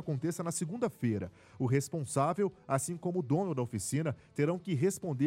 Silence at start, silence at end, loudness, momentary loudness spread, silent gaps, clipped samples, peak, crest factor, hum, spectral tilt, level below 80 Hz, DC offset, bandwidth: 0 s; 0 s; -34 LUFS; 4 LU; none; under 0.1%; -14 dBFS; 18 dB; none; -6.5 dB/octave; -68 dBFS; under 0.1%; 16 kHz